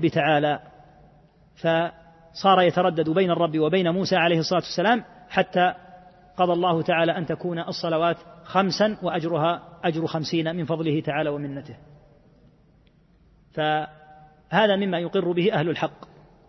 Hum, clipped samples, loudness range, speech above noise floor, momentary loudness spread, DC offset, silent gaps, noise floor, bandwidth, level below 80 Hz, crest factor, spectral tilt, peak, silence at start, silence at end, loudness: none; under 0.1%; 8 LU; 35 dB; 8 LU; under 0.1%; none; -58 dBFS; 6.2 kHz; -62 dBFS; 20 dB; -6 dB/octave; -4 dBFS; 0 s; 0.55 s; -23 LUFS